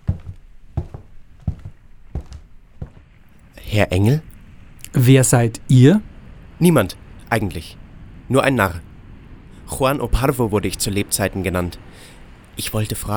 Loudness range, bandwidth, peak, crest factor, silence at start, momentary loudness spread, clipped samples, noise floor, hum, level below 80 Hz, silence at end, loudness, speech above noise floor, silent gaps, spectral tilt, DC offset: 10 LU; over 20 kHz; 0 dBFS; 20 dB; 0.05 s; 25 LU; under 0.1%; -46 dBFS; none; -36 dBFS; 0 s; -18 LUFS; 30 dB; none; -5.5 dB/octave; under 0.1%